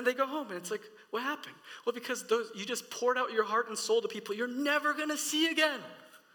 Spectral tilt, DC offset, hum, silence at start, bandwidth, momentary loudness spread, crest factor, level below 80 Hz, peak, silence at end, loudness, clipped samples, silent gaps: -1.5 dB/octave; under 0.1%; none; 0 s; 19 kHz; 11 LU; 20 dB; under -90 dBFS; -12 dBFS; 0.2 s; -32 LUFS; under 0.1%; none